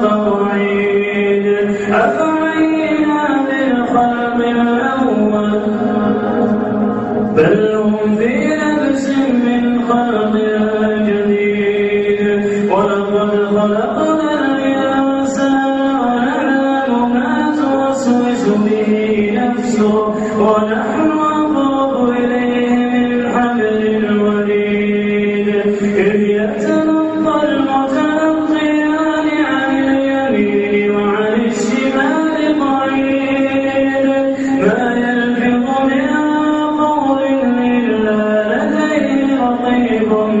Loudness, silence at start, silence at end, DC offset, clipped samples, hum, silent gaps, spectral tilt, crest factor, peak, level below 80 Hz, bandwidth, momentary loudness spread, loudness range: -14 LUFS; 0 s; 0 s; under 0.1%; under 0.1%; none; none; -6.5 dB/octave; 12 dB; 0 dBFS; -48 dBFS; 8.2 kHz; 1 LU; 0 LU